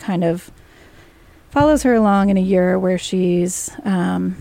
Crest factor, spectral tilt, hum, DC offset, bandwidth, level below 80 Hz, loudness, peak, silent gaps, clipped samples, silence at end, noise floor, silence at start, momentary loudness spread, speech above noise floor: 14 dB; -6 dB/octave; none; under 0.1%; 15.5 kHz; -42 dBFS; -17 LUFS; -4 dBFS; none; under 0.1%; 0 s; -47 dBFS; 0 s; 8 LU; 30 dB